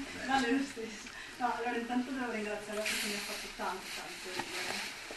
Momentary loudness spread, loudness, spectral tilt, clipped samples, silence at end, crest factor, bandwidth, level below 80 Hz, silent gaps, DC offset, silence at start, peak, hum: 8 LU; -36 LUFS; -2.5 dB/octave; under 0.1%; 0 s; 18 dB; 12.5 kHz; -62 dBFS; none; under 0.1%; 0 s; -18 dBFS; none